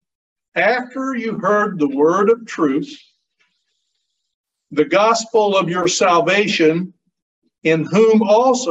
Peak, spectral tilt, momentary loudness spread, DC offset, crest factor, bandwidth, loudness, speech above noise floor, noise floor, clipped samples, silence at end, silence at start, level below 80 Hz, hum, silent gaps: -2 dBFS; -4.5 dB/octave; 10 LU; under 0.1%; 14 dB; 8.4 kHz; -16 LUFS; 57 dB; -73 dBFS; under 0.1%; 0 s; 0.55 s; -66 dBFS; none; 4.34-4.44 s, 7.22-7.42 s